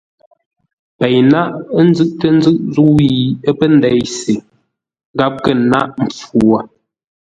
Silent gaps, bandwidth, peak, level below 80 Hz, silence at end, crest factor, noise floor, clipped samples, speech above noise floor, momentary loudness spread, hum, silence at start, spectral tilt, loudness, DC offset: 5.05-5.14 s; 9.4 kHz; 0 dBFS; -46 dBFS; 0.55 s; 14 dB; -62 dBFS; under 0.1%; 50 dB; 8 LU; none; 1 s; -6.5 dB/octave; -13 LUFS; under 0.1%